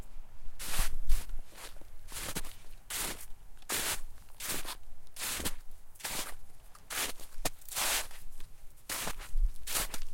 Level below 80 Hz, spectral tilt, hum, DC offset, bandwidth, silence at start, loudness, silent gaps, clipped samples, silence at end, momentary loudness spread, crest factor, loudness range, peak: -38 dBFS; -1.5 dB/octave; none; under 0.1%; 16.5 kHz; 0 s; -37 LUFS; none; under 0.1%; 0 s; 21 LU; 20 dB; 4 LU; -12 dBFS